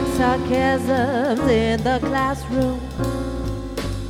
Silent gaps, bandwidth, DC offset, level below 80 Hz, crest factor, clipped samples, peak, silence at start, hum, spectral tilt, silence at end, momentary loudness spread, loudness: none; 16.5 kHz; under 0.1%; -32 dBFS; 14 dB; under 0.1%; -6 dBFS; 0 s; none; -6 dB/octave; 0 s; 9 LU; -21 LUFS